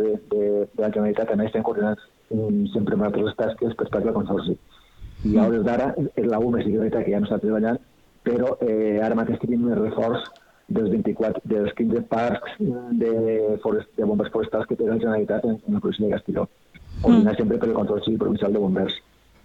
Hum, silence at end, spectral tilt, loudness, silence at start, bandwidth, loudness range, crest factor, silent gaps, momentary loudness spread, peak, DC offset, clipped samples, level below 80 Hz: none; 0.45 s; -9 dB/octave; -23 LUFS; 0 s; 5.8 kHz; 2 LU; 18 dB; none; 5 LU; -4 dBFS; under 0.1%; under 0.1%; -48 dBFS